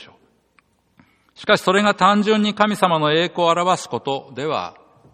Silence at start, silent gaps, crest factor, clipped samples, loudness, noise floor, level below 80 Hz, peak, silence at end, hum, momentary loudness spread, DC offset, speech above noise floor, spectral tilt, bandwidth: 0 s; none; 20 dB; under 0.1%; -18 LUFS; -61 dBFS; -62 dBFS; 0 dBFS; 0.45 s; none; 11 LU; under 0.1%; 43 dB; -4.5 dB/octave; 15 kHz